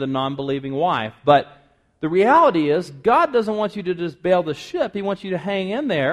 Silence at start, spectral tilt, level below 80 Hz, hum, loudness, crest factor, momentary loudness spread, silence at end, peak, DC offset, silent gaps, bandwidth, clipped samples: 0 s; -6.5 dB/octave; -58 dBFS; none; -20 LUFS; 18 dB; 10 LU; 0 s; -2 dBFS; under 0.1%; none; 12 kHz; under 0.1%